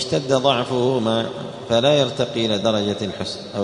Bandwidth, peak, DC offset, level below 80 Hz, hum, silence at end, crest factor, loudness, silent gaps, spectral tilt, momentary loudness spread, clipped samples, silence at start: 10.5 kHz; -2 dBFS; under 0.1%; -54 dBFS; none; 0 s; 18 dB; -20 LUFS; none; -5 dB/octave; 10 LU; under 0.1%; 0 s